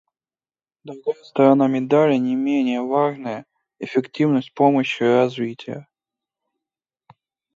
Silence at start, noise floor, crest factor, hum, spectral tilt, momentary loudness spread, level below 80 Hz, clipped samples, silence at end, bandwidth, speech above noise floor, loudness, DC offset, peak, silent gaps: 0.85 s; under -90 dBFS; 18 dB; none; -7.5 dB/octave; 17 LU; -72 dBFS; under 0.1%; 1.75 s; 7.4 kHz; over 71 dB; -19 LUFS; under 0.1%; -2 dBFS; none